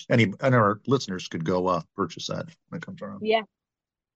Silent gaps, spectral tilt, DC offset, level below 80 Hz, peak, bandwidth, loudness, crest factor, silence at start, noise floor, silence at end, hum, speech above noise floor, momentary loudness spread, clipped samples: none; -6 dB/octave; under 0.1%; -64 dBFS; -8 dBFS; 8 kHz; -25 LUFS; 18 dB; 0 s; under -90 dBFS; 0.7 s; none; over 64 dB; 16 LU; under 0.1%